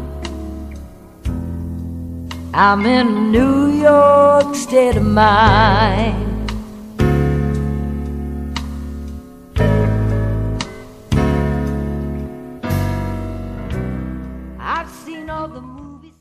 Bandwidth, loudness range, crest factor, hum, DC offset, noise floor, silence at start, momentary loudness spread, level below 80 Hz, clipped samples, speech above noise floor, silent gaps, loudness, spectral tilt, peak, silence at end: 15 kHz; 12 LU; 16 dB; none; under 0.1%; -37 dBFS; 0 s; 19 LU; -26 dBFS; under 0.1%; 25 dB; none; -16 LUFS; -6.5 dB/octave; 0 dBFS; 0.2 s